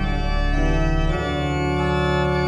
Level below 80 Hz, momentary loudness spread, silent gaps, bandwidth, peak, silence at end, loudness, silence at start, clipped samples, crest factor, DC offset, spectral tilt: -24 dBFS; 3 LU; none; 8.2 kHz; -8 dBFS; 0 s; -22 LUFS; 0 s; under 0.1%; 12 dB; under 0.1%; -6.5 dB/octave